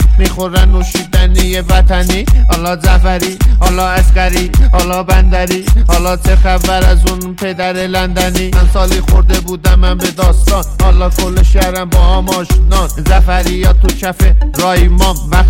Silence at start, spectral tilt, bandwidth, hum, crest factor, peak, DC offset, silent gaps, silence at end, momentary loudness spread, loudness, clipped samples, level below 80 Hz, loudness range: 0 s; -5 dB/octave; 16.5 kHz; none; 8 dB; 0 dBFS; under 0.1%; none; 0 s; 3 LU; -11 LUFS; under 0.1%; -10 dBFS; 1 LU